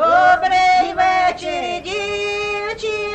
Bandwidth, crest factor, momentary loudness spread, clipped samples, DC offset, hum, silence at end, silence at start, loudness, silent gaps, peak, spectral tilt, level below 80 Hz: 8.8 kHz; 14 dB; 10 LU; under 0.1%; under 0.1%; none; 0 s; 0 s; -17 LUFS; none; -2 dBFS; -3 dB/octave; -46 dBFS